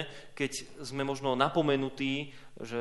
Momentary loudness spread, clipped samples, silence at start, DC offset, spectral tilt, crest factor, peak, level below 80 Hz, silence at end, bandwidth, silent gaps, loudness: 13 LU; under 0.1%; 0 s; under 0.1%; -5 dB/octave; 22 dB; -12 dBFS; -64 dBFS; 0 s; 11.5 kHz; none; -32 LUFS